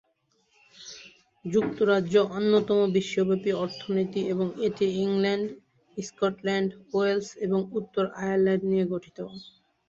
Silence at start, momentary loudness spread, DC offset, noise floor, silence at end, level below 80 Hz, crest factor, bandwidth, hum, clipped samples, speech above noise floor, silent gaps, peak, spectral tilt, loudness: 0.8 s; 17 LU; under 0.1%; -70 dBFS; 0.4 s; -66 dBFS; 18 dB; 7.6 kHz; none; under 0.1%; 44 dB; none; -10 dBFS; -6.5 dB/octave; -26 LUFS